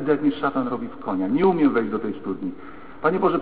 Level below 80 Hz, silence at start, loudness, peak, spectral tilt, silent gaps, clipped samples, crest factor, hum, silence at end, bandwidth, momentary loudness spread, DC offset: -56 dBFS; 0 s; -23 LUFS; -6 dBFS; -11.5 dB/octave; none; under 0.1%; 16 dB; none; 0 s; 4.8 kHz; 12 LU; 0.9%